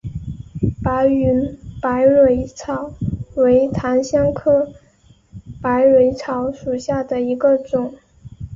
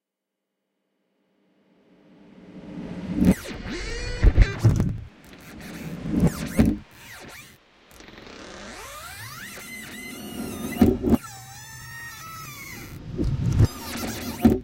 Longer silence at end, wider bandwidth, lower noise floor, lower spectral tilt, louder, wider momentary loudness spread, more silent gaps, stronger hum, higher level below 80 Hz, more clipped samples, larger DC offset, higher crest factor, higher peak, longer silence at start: about the same, 0 s vs 0 s; second, 7.6 kHz vs 17 kHz; second, -52 dBFS vs -84 dBFS; about the same, -7.5 dB/octave vs -6.5 dB/octave; first, -18 LUFS vs -26 LUFS; second, 13 LU vs 21 LU; neither; neither; second, -38 dBFS vs -32 dBFS; neither; neither; second, 14 dB vs 24 dB; about the same, -4 dBFS vs -2 dBFS; second, 0.05 s vs 2.4 s